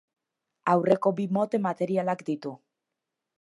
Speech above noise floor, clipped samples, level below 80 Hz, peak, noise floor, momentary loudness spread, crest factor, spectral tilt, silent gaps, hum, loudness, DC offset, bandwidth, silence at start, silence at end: 60 dB; under 0.1%; -78 dBFS; -8 dBFS; -86 dBFS; 10 LU; 20 dB; -8 dB/octave; none; none; -27 LUFS; under 0.1%; 11.5 kHz; 0.65 s; 0.85 s